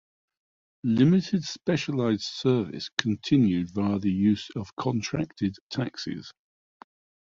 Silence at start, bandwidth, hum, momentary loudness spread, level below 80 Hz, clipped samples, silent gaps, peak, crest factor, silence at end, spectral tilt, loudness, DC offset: 0.85 s; 7.6 kHz; none; 10 LU; -56 dBFS; under 0.1%; 2.92-2.97 s, 4.73-4.77 s, 5.61-5.70 s; -2 dBFS; 26 dB; 0.9 s; -6.5 dB/octave; -27 LUFS; under 0.1%